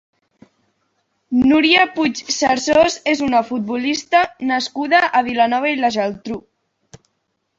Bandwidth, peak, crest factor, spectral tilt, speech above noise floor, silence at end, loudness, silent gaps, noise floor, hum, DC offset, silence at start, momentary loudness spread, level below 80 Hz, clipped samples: 7.8 kHz; -2 dBFS; 16 dB; -3 dB/octave; 54 dB; 0.65 s; -16 LUFS; none; -71 dBFS; none; under 0.1%; 1.3 s; 9 LU; -54 dBFS; under 0.1%